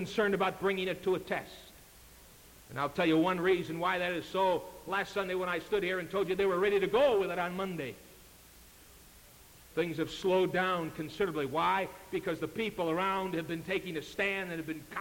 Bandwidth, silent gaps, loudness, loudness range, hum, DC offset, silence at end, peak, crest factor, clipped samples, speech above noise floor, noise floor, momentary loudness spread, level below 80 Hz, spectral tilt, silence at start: 17 kHz; none; -32 LUFS; 4 LU; none; under 0.1%; 0 s; -16 dBFS; 16 dB; under 0.1%; 24 dB; -56 dBFS; 10 LU; -62 dBFS; -5.5 dB/octave; 0 s